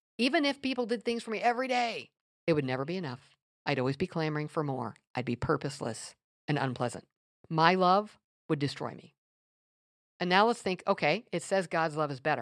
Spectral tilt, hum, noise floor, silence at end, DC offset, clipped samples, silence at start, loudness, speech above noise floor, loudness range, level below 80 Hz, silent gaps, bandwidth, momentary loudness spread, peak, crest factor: -5.5 dB/octave; none; under -90 dBFS; 0 s; under 0.1%; under 0.1%; 0.2 s; -31 LUFS; over 60 dB; 4 LU; -68 dBFS; 2.21-2.47 s, 3.42-3.65 s, 5.10-5.14 s, 6.24-6.48 s, 7.17-7.44 s, 8.24-8.49 s, 9.18-10.20 s; 13 kHz; 13 LU; -6 dBFS; 26 dB